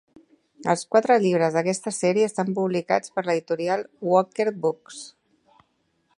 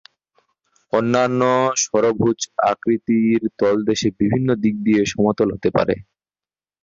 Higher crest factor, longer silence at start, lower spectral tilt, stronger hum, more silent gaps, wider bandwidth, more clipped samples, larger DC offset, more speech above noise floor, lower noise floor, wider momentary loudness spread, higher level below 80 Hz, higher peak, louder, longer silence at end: about the same, 20 dB vs 16 dB; second, 0.6 s vs 0.95 s; about the same, -5 dB/octave vs -5 dB/octave; neither; neither; first, 11.5 kHz vs 7.4 kHz; neither; neither; second, 47 dB vs over 72 dB; second, -69 dBFS vs under -90 dBFS; first, 9 LU vs 3 LU; second, -74 dBFS vs -52 dBFS; about the same, -4 dBFS vs -4 dBFS; second, -23 LUFS vs -19 LUFS; first, 1.1 s vs 0.8 s